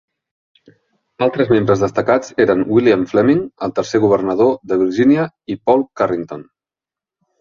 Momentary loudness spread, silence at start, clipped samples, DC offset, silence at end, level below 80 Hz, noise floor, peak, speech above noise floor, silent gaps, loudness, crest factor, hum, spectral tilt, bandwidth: 8 LU; 1.2 s; under 0.1%; under 0.1%; 1 s; -52 dBFS; -89 dBFS; 0 dBFS; 74 dB; none; -16 LUFS; 16 dB; none; -7 dB/octave; 7.4 kHz